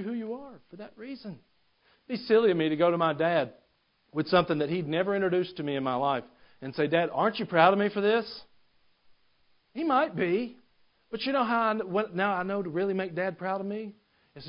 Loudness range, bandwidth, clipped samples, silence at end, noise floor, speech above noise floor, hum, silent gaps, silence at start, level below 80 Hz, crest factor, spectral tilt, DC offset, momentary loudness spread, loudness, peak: 3 LU; 5.4 kHz; under 0.1%; 0 s; -70 dBFS; 42 dB; none; none; 0 s; -68 dBFS; 24 dB; -10 dB/octave; under 0.1%; 18 LU; -28 LUFS; -6 dBFS